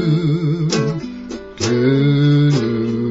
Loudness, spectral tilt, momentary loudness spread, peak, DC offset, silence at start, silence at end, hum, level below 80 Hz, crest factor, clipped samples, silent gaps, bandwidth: -16 LUFS; -6.5 dB/octave; 14 LU; -4 dBFS; under 0.1%; 0 s; 0 s; none; -46 dBFS; 12 dB; under 0.1%; none; 7.8 kHz